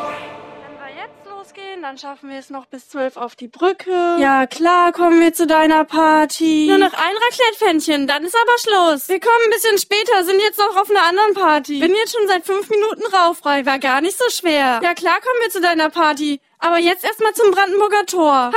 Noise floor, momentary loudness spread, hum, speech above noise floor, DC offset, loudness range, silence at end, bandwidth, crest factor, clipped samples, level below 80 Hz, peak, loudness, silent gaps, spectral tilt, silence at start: -37 dBFS; 18 LU; none; 22 dB; under 0.1%; 7 LU; 0 s; 16.5 kHz; 14 dB; under 0.1%; -62 dBFS; -2 dBFS; -15 LUFS; none; -1.5 dB/octave; 0 s